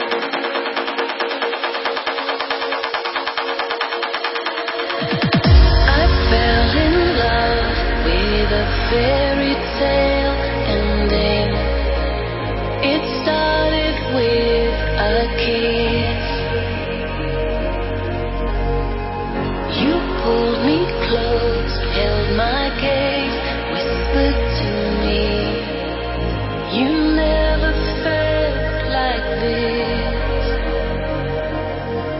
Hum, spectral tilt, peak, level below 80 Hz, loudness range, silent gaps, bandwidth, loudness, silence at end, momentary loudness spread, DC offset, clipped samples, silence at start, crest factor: none; -10 dB/octave; -2 dBFS; -24 dBFS; 5 LU; none; 5.8 kHz; -19 LUFS; 0 s; 7 LU; under 0.1%; under 0.1%; 0 s; 16 dB